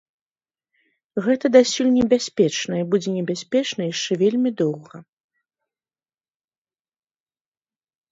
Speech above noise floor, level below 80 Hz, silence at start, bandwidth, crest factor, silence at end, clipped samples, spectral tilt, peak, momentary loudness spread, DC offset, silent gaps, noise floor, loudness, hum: over 70 dB; -60 dBFS; 1.15 s; 7.8 kHz; 20 dB; 3.1 s; under 0.1%; -5 dB/octave; -2 dBFS; 9 LU; under 0.1%; none; under -90 dBFS; -20 LUFS; none